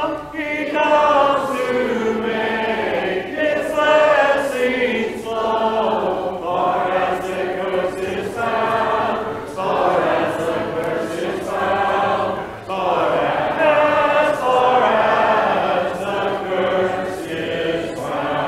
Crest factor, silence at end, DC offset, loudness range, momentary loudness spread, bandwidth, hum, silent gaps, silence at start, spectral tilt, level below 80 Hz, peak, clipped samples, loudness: 16 dB; 0 s; under 0.1%; 4 LU; 9 LU; 15 kHz; none; none; 0 s; -5 dB/octave; -50 dBFS; -2 dBFS; under 0.1%; -19 LUFS